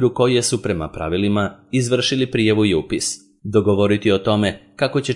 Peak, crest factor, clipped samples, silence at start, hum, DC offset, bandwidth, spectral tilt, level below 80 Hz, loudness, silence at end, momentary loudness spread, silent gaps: -4 dBFS; 16 dB; under 0.1%; 0 s; none; under 0.1%; 11.5 kHz; -5 dB/octave; -48 dBFS; -19 LUFS; 0 s; 7 LU; none